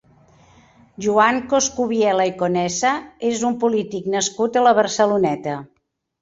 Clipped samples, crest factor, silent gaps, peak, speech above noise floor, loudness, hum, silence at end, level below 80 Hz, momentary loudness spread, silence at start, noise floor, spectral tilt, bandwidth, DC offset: under 0.1%; 18 dB; none; -2 dBFS; 33 dB; -19 LUFS; none; 0.55 s; -58 dBFS; 8 LU; 1 s; -52 dBFS; -3.5 dB/octave; 8 kHz; under 0.1%